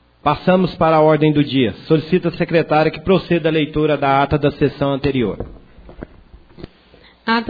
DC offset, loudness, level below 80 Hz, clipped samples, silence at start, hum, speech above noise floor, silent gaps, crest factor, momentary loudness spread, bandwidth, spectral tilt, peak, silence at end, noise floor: under 0.1%; -16 LUFS; -40 dBFS; under 0.1%; 0.25 s; none; 32 dB; none; 16 dB; 7 LU; 5 kHz; -9.5 dB/octave; 0 dBFS; 0 s; -48 dBFS